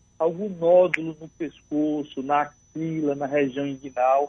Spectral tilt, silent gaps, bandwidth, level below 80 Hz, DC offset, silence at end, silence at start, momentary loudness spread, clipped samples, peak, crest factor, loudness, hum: -7 dB/octave; none; 7.2 kHz; -64 dBFS; under 0.1%; 0 s; 0.2 s; 14 LU; under 0.1%; -4 dBFS; 20 dB; -24 LUFS; none